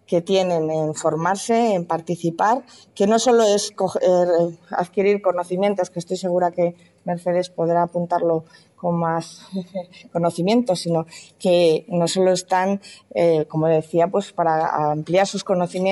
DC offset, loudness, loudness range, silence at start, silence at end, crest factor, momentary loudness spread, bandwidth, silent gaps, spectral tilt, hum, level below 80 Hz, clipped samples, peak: under 0.1%; -20 LUFS; 4 LU; 0.1 s; 0 s; 14 dB; 9 LU; 12 kHz; none; -5.5 dB/octave; none; -68 dBFS; under 0.1%; -6 dBFS